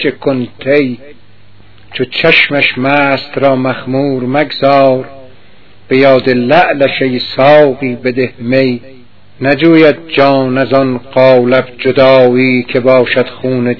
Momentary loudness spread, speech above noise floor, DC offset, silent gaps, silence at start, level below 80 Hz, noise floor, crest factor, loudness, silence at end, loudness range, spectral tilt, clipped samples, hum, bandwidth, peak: 9 LU; 34 dB; 2%; none; 0 s; -48 dBFS; -43 dBFS; 10 dB; -9 LUFS; 0 s; 3 LU; -8 dB/octave; 1%; none; 5.4 kHz; 0 dBFS